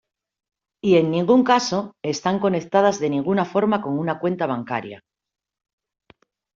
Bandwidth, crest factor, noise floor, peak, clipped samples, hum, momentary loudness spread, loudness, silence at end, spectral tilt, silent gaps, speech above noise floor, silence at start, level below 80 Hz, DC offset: 7.6 kHz; 18 dB; -58 dBFS; -4 dBFS; under 0.1%; none; 9 LU; -21 LUFS; 1.6 s; -5.5 dB/octave; none; 37 dB; 0.85 s; -64 dBFS; under 0.1%